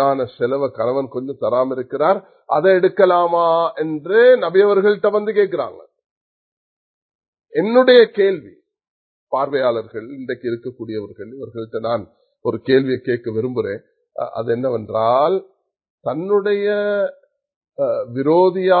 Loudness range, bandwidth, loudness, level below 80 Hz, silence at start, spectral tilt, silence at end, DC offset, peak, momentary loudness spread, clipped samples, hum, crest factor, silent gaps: 8 LU; 4.6 kHz; -18 LUFS; -64 dBFS; 0 s; -10 dB/octave; 0 s; under 0.1%; 0 dBFS; 15 LU; under 0.1%; none; 18 dB; 6.06-7.09 s, 7.15-7.19 s, 7.28-7.33 s, 8.88-9.27 s, 15.90-15.98 s, 17.56-17.61 s